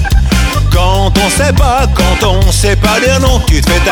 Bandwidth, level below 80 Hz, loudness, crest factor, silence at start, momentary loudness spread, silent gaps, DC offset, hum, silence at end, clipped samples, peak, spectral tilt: 18 kHz; -12 dBFS; -10 LUFS; 8 dB; 0 s; 2 LU; none; under 0.1%; none; 0 s; 0.3%; 0 dBFS; -4.5 dB/octave